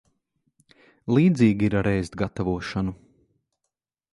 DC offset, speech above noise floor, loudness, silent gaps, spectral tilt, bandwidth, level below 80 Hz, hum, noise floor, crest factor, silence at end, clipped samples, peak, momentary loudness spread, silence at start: under 0.1%; 61 dB; -23 LUFS; none; -8 dB/octave; 11.5 kHz; -46 dBFS; none; -83 dBFS; 18 dB; 1.2 s; under 0.1%; -6 dBFS; 11 LU; 1.05 s